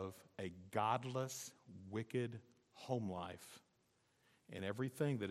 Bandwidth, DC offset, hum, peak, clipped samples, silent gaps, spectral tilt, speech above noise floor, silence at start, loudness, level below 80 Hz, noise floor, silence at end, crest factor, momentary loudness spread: 15.5 kHz; under 0.1%; none; -24 dBFS; under 0.1%; none; -5.5 dB/octave; 36 dB; 0 s; -44 LUFS; -86 dBFS; -79 dBFS; 0 s; 22 dB; 18 LU